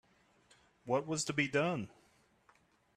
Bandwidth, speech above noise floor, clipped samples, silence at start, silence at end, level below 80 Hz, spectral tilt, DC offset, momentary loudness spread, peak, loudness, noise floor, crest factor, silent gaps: 13 kHz; 35 dB; under 0.1%; 0.85 s; 1.1 s; -74 dBFS; -4.5 dB/octave; under 0.1%; 15 LU; -18 dBFS; -35 LUFS; -70 dBFS; 20 dB; none